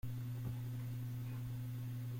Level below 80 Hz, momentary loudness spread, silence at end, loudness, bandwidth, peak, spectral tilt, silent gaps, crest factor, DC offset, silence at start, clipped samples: -62 dBFS; 1 LU; 0 s; -44 LUFS; 16.5 kHz; -32 dBFS; -7.5 dB/octave; none; 12 dB; under 0.1%; 0.05 s; under 0.1%